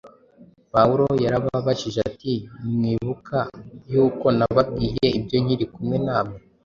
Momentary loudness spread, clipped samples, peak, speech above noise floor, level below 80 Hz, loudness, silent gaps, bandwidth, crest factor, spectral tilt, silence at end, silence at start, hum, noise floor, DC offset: 9 LU; under 0.1%; -2 dBFS; 30 dB; -46 dBFS; -22 LUFS; none; 7.4 kHz; 20 dB; -7.5 dB/octave; 0.25 s; 0.05 s; none; -52 dBFS; under 0.1%